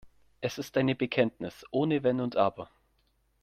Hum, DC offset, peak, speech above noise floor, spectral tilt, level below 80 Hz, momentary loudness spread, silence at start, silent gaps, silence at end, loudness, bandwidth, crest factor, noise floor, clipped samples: none; under 0.1%; -12 dBFS; 42 dB; -6.5 dB/octave; -66 dBFS; 12 LU; 0.05 s; none; 0.75 s; -30 LUFS; 15 kHz; 20 dB; -71 dBFS; under 0.1%